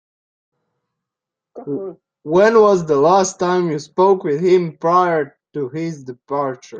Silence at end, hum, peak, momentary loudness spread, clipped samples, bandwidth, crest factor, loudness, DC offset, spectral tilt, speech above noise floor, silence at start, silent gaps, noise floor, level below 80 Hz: 0 s; none; -2 dBFS; 14 LU; under 0.1%; 8.8 kHz; 16 dB; -16 LUFS; under 0.1%; -5.5 dB/octave; 69 dB; 1.55 s; none; -85 dBFS; -62 dBFS